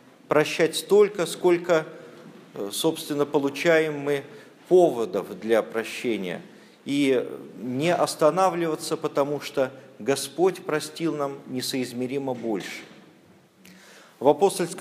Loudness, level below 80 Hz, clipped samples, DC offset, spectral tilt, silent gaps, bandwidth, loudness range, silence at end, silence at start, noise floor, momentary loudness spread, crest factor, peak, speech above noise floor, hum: -24 LUFS; -78 dBFS; under 0.1%; under 0.1%; -4.5 dB/octave; none; 15.5 kHz; 5 LU; 0 s; 0.3 s; -55 dBFS; 13 LU; 22 dB; -4 dBFS; 31 dB; none